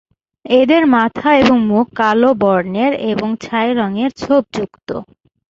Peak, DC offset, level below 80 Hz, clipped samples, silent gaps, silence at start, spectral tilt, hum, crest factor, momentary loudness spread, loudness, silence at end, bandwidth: 0 dBFS; under 0.1%; -50 dBFS; under 0.1%; none; 0.45 s; -6.5 dB/octave; none; 14 dB; 13 LU; -14 LUFS; 0.45 s; 7.6 kHz